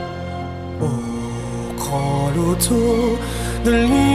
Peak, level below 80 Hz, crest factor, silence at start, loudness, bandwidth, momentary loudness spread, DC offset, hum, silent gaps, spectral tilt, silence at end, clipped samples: -4 dBFS; -30 dBFS; 14 dB; 0 s; -20 LUFS; 16 kHz; 12 LU; under 0.1%; none; none; -5.5 dB/octave; 0 s; under 0.1%